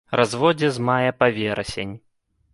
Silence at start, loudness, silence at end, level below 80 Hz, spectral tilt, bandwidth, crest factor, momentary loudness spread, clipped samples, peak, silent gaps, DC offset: 0.1 s; -21 LUFS; 0.55 s; -52 dBFS; -5.5 dB/octave; 11.5 kHz; 20 dB; 11 LU; under 0.1%; -2 dBFS; none; under 0.1%